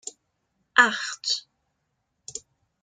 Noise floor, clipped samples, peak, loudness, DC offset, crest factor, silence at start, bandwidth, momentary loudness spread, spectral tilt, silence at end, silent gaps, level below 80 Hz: -77 dBFS; under 0.1%; -2 dBFS; -23 LUFS; under 0.1%; 26 dB; 0.05 s; 9.6 kHz; 20 LU; 0 dB/octave; 0.45 s; none; -76 dBFS